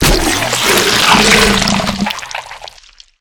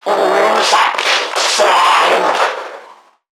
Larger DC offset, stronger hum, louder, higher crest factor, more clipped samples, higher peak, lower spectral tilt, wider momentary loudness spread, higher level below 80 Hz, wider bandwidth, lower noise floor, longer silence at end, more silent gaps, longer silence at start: neither; neither; about the same, -10 LUFS vs -12 LUFS; about the same, 12 dB vs 14 dB; first, 0.2% vs under 0.1%; about the same, 0 dBFS vs 0 dBFS; first, -2.5 dB/octave vs -0.5 dB/octave; first, 17 LU vs 7 LU; first, -26 dBFS vs -70 dBFS; about the same, over 20 kHz vs 18.5 kHz; about the same, -42 dBFS vs -41 dBFS; about the same, 0.5 s vs 0.4 s; neither; about the same, 0 s vs 0.05 s